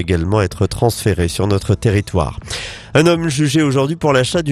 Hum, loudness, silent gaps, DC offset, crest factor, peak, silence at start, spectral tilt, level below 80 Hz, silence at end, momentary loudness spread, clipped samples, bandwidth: none; -16 LUFS; none; under 0.1%; 16 dB; 0 dBFS; 0 s; -5.5 dB/octave; -34 dBFS; 0 s; 6 LU; under 0.1%; 14 kHz